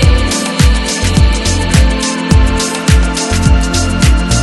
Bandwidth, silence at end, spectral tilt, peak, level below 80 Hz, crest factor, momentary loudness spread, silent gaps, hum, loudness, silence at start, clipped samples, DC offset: 12.5 kHz; 0 s; -4.5 dB/octave; 0 dBFS; -12 dBFS; 10 dB; 3 LU; none; none; -11 LUFS; 0 s; 0.4%; under 0.1%